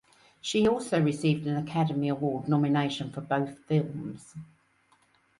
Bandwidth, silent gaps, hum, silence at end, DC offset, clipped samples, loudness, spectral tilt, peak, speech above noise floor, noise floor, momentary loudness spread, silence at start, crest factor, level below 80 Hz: 11.5 kHz; none; none; 0.95 s; under 0.1%; under 0.1%; -28 LUFS; -6.5 dB/octave; -14 dBFS; 38 dB; -66 dBFS; 13 LU; 0.45 s; 16 dB; -64 dBFS